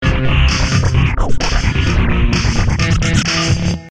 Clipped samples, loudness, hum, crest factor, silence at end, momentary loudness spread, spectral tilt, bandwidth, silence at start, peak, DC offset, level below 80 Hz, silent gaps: under 0.1%; -15 LUFS; none; 12 dB; 0 s; 3 LU; -5 dB/octave; 10.5 kHz; 0 s; -2 dBFS; under 0.1%; -18 dBFS; none